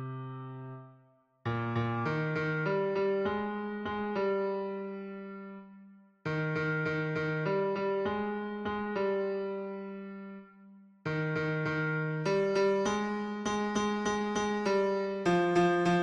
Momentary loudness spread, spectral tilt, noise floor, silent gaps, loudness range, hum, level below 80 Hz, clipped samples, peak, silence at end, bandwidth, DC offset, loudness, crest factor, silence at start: 15 LU; -6 dB/octave; -64 dBFS; none; 5 LU; none; -64 dBFS; under 0.1%; -16 dBFS; 0 s; 10 kHz; under 0.1%; -32 LUFS; 16 dB; 0 s